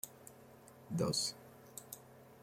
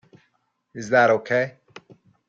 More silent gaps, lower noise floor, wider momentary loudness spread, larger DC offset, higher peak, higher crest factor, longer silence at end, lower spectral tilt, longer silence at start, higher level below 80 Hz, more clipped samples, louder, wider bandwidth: neither; second, -59 dBFS vs -70 dBFS; first, 23 LU vs 19 LU; neither; second, -22 dBFS vs -6 dBFS; about the same, 22 dB vs 18 dB; second, 0 s vs 0.8 s; second, -4 dB/octave vs -5.5 dB/octave; second, 0.05 s vs 0.75 s; second, -74 dBFS vs -68 dBFS; neither; second, -39 LUFS vs -20 LUFS; first, 16.5 kHz vs 7.8 kHz